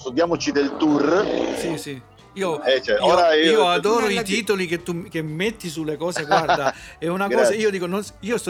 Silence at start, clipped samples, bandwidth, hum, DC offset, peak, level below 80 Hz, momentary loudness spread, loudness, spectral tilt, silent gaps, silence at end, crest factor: 0 s; under 0.1%; 16.5 kHz; none; under 0.1%; -4 dBFS; -54 dBFS; 12 LU; -21 LUFS; -4.5 dB/octave; none; 0 s; 16 dB